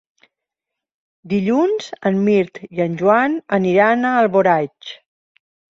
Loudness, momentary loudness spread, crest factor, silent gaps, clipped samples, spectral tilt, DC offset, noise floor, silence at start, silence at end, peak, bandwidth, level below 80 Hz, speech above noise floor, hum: -17 LUFS; 9 LU; 16 dB; none; under 0.1%; -7 dB/octave; under 0.1%; -84 dBFS; 1.25 s; 0.85 s; -2 dBFS; 7.6 kHz; -62 dBFS; 67 dB; none